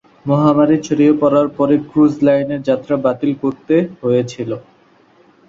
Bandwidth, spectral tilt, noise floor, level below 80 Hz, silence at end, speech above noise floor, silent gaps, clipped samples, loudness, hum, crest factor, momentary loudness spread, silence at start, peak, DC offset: 7.6 kHz; -8 dB/octave; -51 dBFS; -56 dBFS; 0.9 s; 36 dB; none; under 0.1%; -15 LUFS; none; 14 dB; 8 LU; 0.25 s; -2 dBFS; under 0.1%